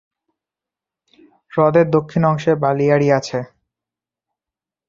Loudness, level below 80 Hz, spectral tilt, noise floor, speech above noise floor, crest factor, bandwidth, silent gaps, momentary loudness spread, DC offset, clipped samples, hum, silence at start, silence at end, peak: -17 LUFS; -56 dBFS; -7.5 dB/octave; -88 dBFS; 73 dB; 18 dB; 7.6 kHz; none; 12 LU; under 0.1%; under 0.1%; none; 1.55 s; 1.45 s; -2 dBFS